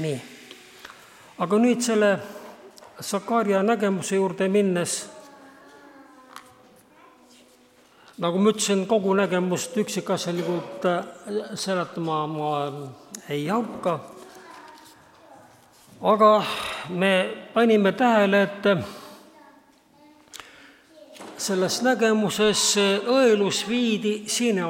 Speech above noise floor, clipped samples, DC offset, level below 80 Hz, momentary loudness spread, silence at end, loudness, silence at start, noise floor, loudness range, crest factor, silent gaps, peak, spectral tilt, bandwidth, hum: 33 dB; under 0.1%; under 0.1%; -68 dBFS; 23 LU; 0 s; -23 LUFS; 0 s; -56 dBFS; 9 LU; 20 dB; none; -6 dBFS; -4 dB/octave; 16.5 kHz; none